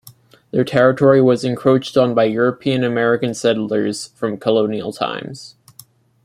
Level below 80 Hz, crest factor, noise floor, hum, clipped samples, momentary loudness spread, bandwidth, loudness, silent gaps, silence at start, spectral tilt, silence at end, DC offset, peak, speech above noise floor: -58 dBFS; 16 dB; -47 dBFS; none; under 0.1%; 11 LU; 16 kHz; -17 LUFS; none; 0.05 s; -6 dB/octave; 0.75 s; under 0.1%; -2 dBFS; 31 dB